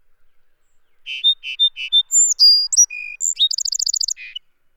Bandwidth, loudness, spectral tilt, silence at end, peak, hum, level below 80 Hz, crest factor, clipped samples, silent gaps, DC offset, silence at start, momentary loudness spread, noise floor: 19 kHz; -14 LUFS; 9 dB/octave; 0.4 s; -4 dBFS; none; -60 dBFS; 14 dB; under 0.1%; none; under 0.1%; 1.05 s; 15 LU; -54 dBFS